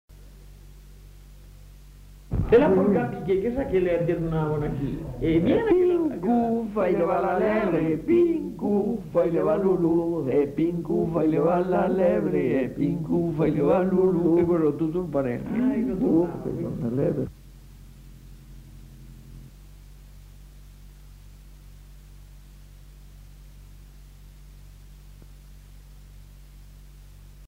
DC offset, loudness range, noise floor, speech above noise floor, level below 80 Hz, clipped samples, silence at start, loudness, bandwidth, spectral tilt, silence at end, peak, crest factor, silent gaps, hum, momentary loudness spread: under 0.1%; 5 LU; -46 dBFS; 24 dB; -44 dBFS; under 0.1%; 0.1 s; -24 LUFS; 15.5 kHz; -9 dB/octave; 0 s; -6 dBFS; 18 dB; none; none; 7 LU